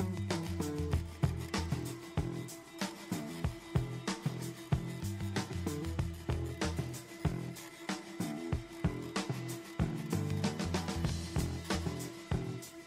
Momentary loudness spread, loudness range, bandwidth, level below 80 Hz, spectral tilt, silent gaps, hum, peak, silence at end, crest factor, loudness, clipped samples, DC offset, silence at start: 6 LU; 2 LU; 16 kHz; -48 dBFS; -5.5 dB/octave; none; none; -18 dBFS; 0 s; 18 dB; -38 LUFS; under 0.1%; under 0.1%; 0 s